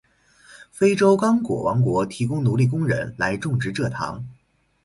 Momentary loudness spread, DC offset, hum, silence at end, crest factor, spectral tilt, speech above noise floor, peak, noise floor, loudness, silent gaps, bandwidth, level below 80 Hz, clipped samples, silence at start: 10 LU; under 0.1%; none; 0.5 s; 18 dB; -7 dB/octave; 33 dB; -4 dBFS; -53 dBFS; -21 LUFS; none; 11.5 kHz; -52 dBFS; under 0.1%; 0.5 s